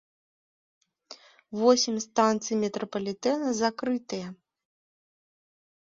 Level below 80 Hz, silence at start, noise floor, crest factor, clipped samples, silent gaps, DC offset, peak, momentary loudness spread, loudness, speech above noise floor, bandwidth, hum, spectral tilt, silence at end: -74 dBFS; 1.1 s; -52 dBFS; 22 dB; under 0.1%; none; under 0.1%; -8 dBFS; 14 LU; -27 LUFS; 25 dB; 7.8 kHz; none; -3.5 dB/octave; 1.5 s